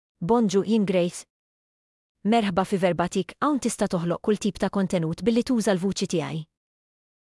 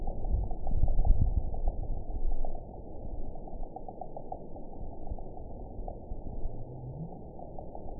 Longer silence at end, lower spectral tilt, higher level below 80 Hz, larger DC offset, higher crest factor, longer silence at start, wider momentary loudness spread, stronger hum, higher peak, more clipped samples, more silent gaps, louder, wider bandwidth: first, 0.95 s vs 0 s; second, -5.5 dB/octave vs -15.5 dB/octave; second, -56 dBFS vs -32 dBFS; second, under 0.1% vs 0.2%; about the same, 16 dB vs 20 dB; first, 0.2 s vs 0 s; second, 6 LU vs 13 LU; neither; about the same, -10 dBFS vs -10 dBFS; neither; first, 1.30-2.15 s vs none; first, -24 LUFS vs -39 LUFS; first, 12 kHz vs 1 kHz